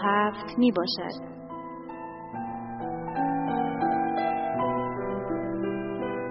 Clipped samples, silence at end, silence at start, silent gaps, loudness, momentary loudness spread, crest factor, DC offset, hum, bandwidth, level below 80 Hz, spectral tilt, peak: under 0.1%; 0 s; 0 s; none; -29 LUFS; 15 LU; 18 dB; under 0.1%; none; 5.8 kHz; -56 dBFS; -4 dB/octave; -10 dBFS